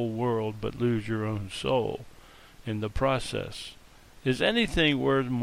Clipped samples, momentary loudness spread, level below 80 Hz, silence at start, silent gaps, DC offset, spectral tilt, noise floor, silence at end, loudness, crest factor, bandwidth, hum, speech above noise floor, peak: under 0.1%; 13 LU; -44 dBFS; 0 s; none; under 0.1%; -6 dB/octave; -51 dBFS; 0 s; -28 LUFS; 18 dB; 16 kHz; none; 23 dB; -10 dBFS